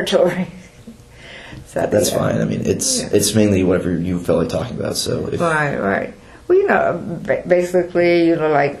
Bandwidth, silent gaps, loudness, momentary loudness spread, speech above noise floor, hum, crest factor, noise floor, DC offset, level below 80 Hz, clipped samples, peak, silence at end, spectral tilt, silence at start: 13.5 kHz; none; -17 LUFS; 11 LU; 24 dB; none; 18 dB; -40 dBFS; under 0.1%; -46 dBFS; under 0.1%; 0 dBFS; 0 s; -4.5 dB/octave; 0 s